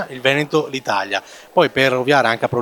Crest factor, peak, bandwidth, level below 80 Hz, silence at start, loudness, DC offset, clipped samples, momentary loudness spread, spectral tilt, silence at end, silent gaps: 18 dB; 0 dBFS; 18 kHz; -58 dBFS; 0 s; -17 LUFS; under 0.1%; under 0.1%; 7 LU; -4.5 dB/octave; 0 s; none